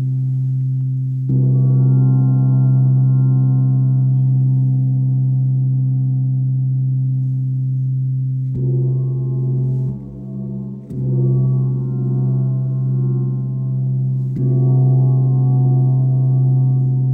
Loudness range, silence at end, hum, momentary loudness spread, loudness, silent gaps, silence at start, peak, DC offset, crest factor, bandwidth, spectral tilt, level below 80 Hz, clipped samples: 5 LU; 0 s; none; 7 LU; -17 LUFS; none; 0 s; -6 dBFS; under 0.1%; 10 dB; 1.5 kHz; -14 dB/octave; -50 dBFS; under 0.1%